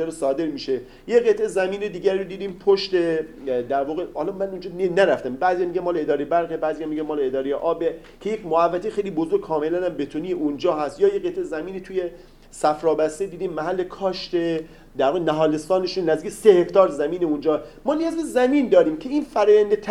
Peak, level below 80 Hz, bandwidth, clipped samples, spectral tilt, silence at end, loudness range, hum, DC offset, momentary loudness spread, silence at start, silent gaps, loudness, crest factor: -2 dBFS; -52 dBFS; 12.5 kHz; under 0.1%; -5.5 dB/octave; 0 s; 5 LU; none; under 0.1%; 10 LU; 0 s; none; -22 LUFS; 20 dB